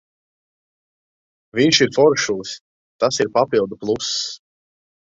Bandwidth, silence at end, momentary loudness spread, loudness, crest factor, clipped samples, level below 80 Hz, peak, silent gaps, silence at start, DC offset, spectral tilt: 8 kHz; 0.7 s; 14 LU; -18 LUFS; 20 dB; under 0.1%; -58 dBFS; 0 dBFS; 2.61-2.99 s; 1.55 s; under 0.1%; -3.5 dB/octave